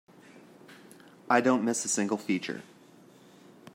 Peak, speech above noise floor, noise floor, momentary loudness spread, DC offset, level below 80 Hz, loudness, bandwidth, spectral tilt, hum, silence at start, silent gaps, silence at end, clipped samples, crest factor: -8 dBFS; 28 dB; -56 dBFS; 11 LU; under 0.1%; -82 dBFS; -28 LUFS; 16 kHz; -3.5 dB/octave; none; 0.35 s; none; 1.1 s; under 0.1%; 24 dB